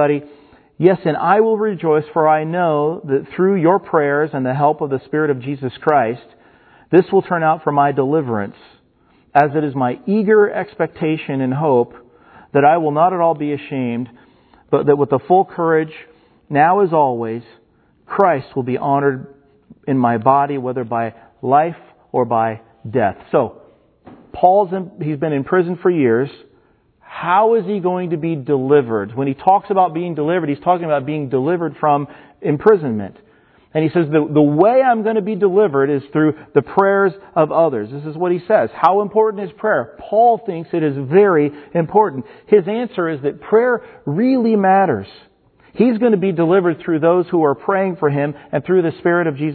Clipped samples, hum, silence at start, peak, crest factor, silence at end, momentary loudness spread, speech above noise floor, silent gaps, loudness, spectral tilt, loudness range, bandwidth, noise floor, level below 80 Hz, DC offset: under 0.1%; none; 0 s; 0 dBFS; 16 dB; 0 s; 9 LU; 39 dB; none; -16 LUFS; -11 dB/octave; 3 LU; 4.5 kHz; -55 dBFS; -60 dBFS; under 0.1%